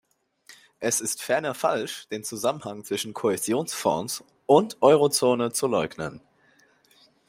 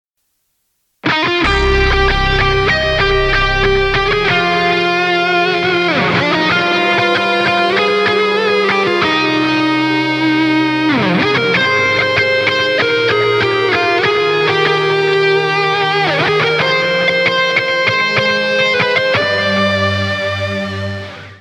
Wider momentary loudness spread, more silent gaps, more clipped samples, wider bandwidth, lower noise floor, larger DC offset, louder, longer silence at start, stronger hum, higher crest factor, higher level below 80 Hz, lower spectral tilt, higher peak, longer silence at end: first, 14 LU vs 2 LU; neither; neither; first, 16 kHz vs 11.5 kHz; second, -61 dBFS vs -67 dBFS; neither; second, -25 LUFS vs -13 LUFS; second, 0.5 s vs 1.05 s; neither; first, 22 dB vs 12 dB; second, -68 dBFS vs -28 dBFS; second, -3.5 dB/octave vs -5 dB/octave; second, -4 dBFS vs 0 dBFS; first, 1.1 s vs 0.05 s